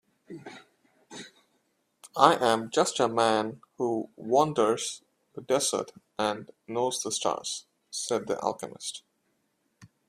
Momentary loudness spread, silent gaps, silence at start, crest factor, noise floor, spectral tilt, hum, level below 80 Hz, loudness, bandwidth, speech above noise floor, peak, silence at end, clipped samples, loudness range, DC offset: 21 LU; none; 0.3 s; 28 dB; -75 dBFS; -3 dB/octave; none; -72 dBFS; -28 LUFS; 15.5 kHz; 47 dB; -2 dBFS; 0.25 s; under 0.1%; 6 LU; under 0.1%